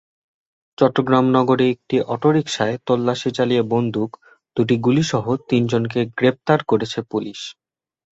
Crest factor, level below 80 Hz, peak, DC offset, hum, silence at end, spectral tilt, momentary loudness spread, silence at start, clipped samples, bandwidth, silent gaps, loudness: 18 dB; -58 dBFS; -2 dBFS; under 0.1%; none; 0.6 s; -6.5 dB/octave; 10 LU; 0.8 s; under 0.1%; 8 kHz; none; -19 LUFS